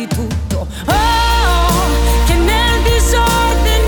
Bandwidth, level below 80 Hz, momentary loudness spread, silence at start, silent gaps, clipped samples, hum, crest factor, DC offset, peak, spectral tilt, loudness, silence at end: over 20 kHz; -16 dBFS; 7 LU; 0 s; none; under 0.1%; none; 10 dB; under 0.1%; -4 dBFS; -4.5 dB/octave; -13 LUFS; 0 s